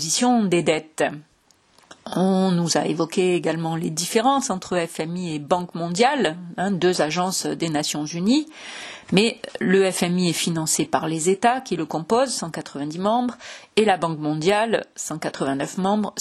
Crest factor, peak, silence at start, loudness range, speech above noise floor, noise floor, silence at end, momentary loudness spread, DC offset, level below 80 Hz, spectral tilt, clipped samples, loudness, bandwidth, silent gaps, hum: 20 dB; -2 dBFS; 0 s; 2 LU; 38 dB; -59 dBFS; 0 s; 9 LU; under 0.1%; -62 dBFS; -4.5 dB/octave; under 0.1%; -22 LUFS; 13 kHz; none; none